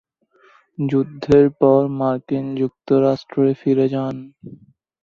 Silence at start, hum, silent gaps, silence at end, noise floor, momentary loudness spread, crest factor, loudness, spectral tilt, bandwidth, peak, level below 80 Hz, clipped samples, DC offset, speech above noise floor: 0.8 s; none; none; 0.5 s; -56 dBFS; 12 LU; 18 dB; -18 LUFS; -9.5 dB/octave; 6.8 kHz; -2 dBFS; -52 dBFS; under 0.1%; under 0.1%; 38 dB